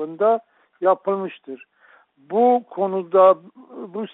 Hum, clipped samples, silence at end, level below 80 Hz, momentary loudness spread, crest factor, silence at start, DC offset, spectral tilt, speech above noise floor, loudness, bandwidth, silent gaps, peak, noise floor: none; under 0.1%; 0.1 s; -72 dBFS; 22 LU; 18 dB; 0 s; under 0.1%; -5.5 dB/octave; 35 dB; -20 LUFS; 4 kHz; none; -4 dBFS; -55 dBFS